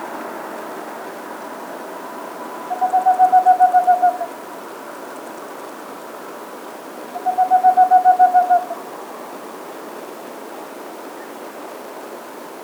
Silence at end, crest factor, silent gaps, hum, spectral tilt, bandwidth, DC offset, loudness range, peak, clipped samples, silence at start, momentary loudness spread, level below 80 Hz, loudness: 0 s; 16 dB; none; none; -3.5 dB/octave; over 20 kHz; under 0.1%; 16 LU; -4 dBFS; under 0.1%; 0 s; 21 LU; -84 dBFS; -16 LUFS